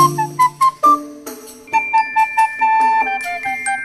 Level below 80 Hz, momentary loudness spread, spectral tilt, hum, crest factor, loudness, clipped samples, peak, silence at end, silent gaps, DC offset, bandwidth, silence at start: -58 dBFS; 14 LU; -3.5 dB/octave; none; 14 dB; -15 LUFS; under 0.1%; -2 dBFS; 0 s; none; under 0.1%; 14 kHz; 0 s